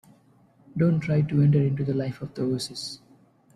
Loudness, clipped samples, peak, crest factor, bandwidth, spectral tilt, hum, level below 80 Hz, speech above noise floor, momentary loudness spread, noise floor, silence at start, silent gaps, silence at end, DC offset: -25 LUFS; under 0.1%; -10 dBFS; 16 dB; 12 kHz; -7.5 dB/octave; none; -56 dBFS; 35 dB; 15 LU; -59 dBFS; 0.75 s; none; 0.6 s; under 0.1%